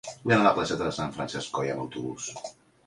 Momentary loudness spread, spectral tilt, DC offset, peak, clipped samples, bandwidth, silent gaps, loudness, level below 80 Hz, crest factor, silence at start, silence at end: 15 LU; -4.5 dB/octave; under 0.1%; -8 dBFS; under 0.1%; 11.5 kHz; none; -28 LUFS; -58 dBFS; 20 dB; 0.05 s; 0.35 s